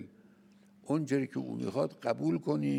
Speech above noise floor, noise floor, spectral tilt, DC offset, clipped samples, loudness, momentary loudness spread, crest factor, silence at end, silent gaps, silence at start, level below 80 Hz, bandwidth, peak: 29 dB; -61 dBFS; -7.5 dB/octave; under 0.1%; under 0.1%; -33 LUFS; 7 LU; 18 dB; 0 s; none; 0 s; -78 dBFS; 12 kHz; -16 dBFS